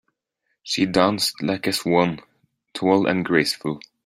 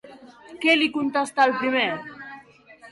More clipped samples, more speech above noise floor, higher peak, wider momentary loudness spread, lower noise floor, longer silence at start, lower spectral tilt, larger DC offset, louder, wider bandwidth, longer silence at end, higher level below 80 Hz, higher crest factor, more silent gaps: neither; first, 55 dB vs 28 dB; first, -2 dBFS vs -8 dBFS; second, 9 LU vs 19 LU; first, -75 dBFS vs -49 dBFS; first, 0.65 s vs 0.05 s; about the same, -4.5 dB/octave vs -3.5 dB/octave; neither; about the same, -21 LUFS vs -21 LUFS; first, 16 kHz vs 11.5 kHz; first, 0.25 s vs 0 s; first, -60 dBFS vs -70 dBFS; about the same, 20 dB vs 18 dB; neither